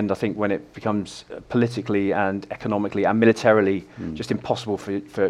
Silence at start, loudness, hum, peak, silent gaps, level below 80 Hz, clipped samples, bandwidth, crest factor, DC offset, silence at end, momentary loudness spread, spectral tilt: 0 s; -23 LUFS; none; -2 dBFS; none; -56 dBFS; under 0.1%; 12 kHz; 20 dB; under 0.1%; 0 s; 11 LU; -6.5 dB/octave